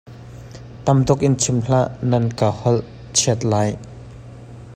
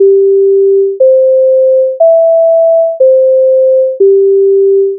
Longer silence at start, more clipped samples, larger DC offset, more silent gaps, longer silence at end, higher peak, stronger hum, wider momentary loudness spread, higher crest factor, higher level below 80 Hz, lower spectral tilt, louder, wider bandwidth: about the same, 0.05 s vs 0 s; neither; neither; neither; about the same, 0 s vs 0 s; about the same, -2 dBFS vs 0 dBFS; neither; first, 22 LU vs 2 LU; first, 18 dB vs 6 dB; first, -44 dBFS vs -80 dBFS; about the same, -5.5 dB/octave vs -6.5 dB/octave; second, -19 LUFS vs -7 LUFS; first, 14 kHz vs 0.8 kHz